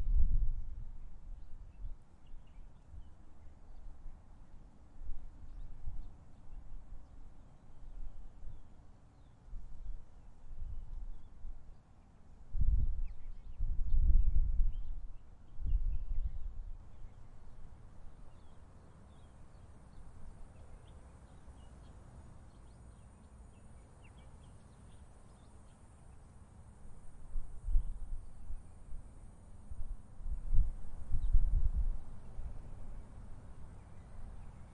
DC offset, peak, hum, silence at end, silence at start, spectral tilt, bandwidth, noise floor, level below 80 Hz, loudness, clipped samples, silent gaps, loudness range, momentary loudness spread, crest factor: under 0.1%; -14 dBFS; none; 0 s; 0 s; -8 dB/octave; 1.7 kHz; -58 dBFS; -38 dBFS; -43 LUFS; under 0.1%; none; 19 LU; 22 LU; 22 dB